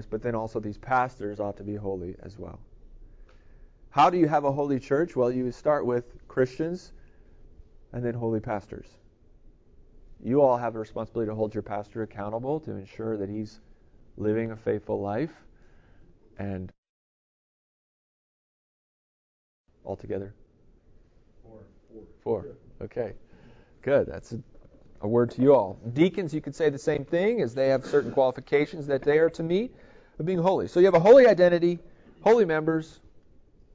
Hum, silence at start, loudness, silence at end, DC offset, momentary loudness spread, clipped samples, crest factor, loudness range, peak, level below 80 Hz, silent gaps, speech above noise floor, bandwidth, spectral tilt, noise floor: none; 0 s; -26 LUFS; 0.55 s; under 0.1%; 18 LU; under 0.1%; 22 dB; 22 LU; -6 dBFS; -54 dBFS; 16.78-16.83 s, 16.89-19.64 s; 32 dB; 7.8 kHz; -7.5 dB/octave; -58 dBFS